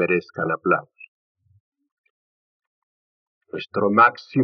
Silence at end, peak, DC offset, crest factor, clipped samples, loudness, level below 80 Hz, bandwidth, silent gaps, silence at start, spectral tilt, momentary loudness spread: 0 s; -4 dBFS; under 0.1%; 22 dB; under 0.1%; -20 LUFS; -78 dBFS; 6.4 kHz; 1.08-1.35 s, 1.60-1.72 s, 1.92-2.04 s, 2.10-2.60 s, 2.67-3.41 s; 0 s; -5 dB/octave; 15 LU